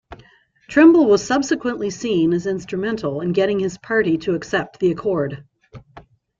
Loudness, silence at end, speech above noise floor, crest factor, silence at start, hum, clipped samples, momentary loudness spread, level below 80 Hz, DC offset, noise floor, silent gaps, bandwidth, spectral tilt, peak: -19 LUFS; 0.4 s; 34 dB; 18 dB; 0.1 s; none; under 0.1%; 11 LU; -54 dBFS; under 0.1%; -52 dBFS; none; 7.6 kHz; -6 dB/octave; -2 dBFS